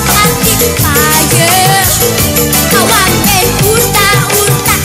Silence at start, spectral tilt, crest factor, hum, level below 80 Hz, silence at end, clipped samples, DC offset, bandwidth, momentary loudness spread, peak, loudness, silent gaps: 0 s; -3 dB/octave; 8 dB; none; -24 dBFS; 0 s; 0.2%; under 0.1%; over 20 kHz; 2 LU; 0 dBFS; -7 LUFS; none